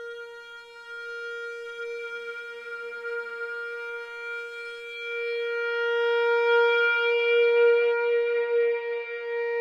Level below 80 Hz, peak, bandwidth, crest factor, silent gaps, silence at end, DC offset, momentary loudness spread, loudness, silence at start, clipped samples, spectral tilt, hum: -78 dBFS; -12 dBFS; 7 kHz; 14 dB; none; 0 s; under 0.1%; 16 LU; -26 LUFS; 0 s; under 0.1%; 0 dB/octave; none